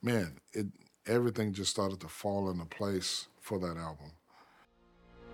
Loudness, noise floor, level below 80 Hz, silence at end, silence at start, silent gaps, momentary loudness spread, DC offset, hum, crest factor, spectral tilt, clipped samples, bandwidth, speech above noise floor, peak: -35 LUFS; -65 dBFS; -64 dBFS; 0 s; 0 s; none; 11 LU; under 0.1%; none; 20 dB; -4.5 dB/octave; under 0.1%; 18.5 kHz; 30 dB; -18 dBFS